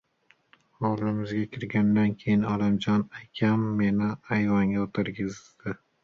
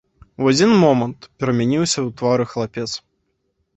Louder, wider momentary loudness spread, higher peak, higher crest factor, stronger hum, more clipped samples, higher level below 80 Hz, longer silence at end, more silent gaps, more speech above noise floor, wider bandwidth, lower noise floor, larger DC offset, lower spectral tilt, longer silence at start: second, -27 LUFS vs -18 LUFS; about the same, 11 LU vs 13 LU; second, -12 dBFS vs -2 dBFS; about the same, 16 dB vs 18 dB; neither; neither; about the same, -56 dBFS vs -54 dBFS; second, 0.3 s vs 0.8 s; neither; second, 39 dB vs 52 dB; second, 7 kHz vs 8.2 kHz; second, -65 dBFS vs -70 dBFS; neither; first, -8 dB/octave vs -5 dB/octave; first, 0.8 s vs 0.4 s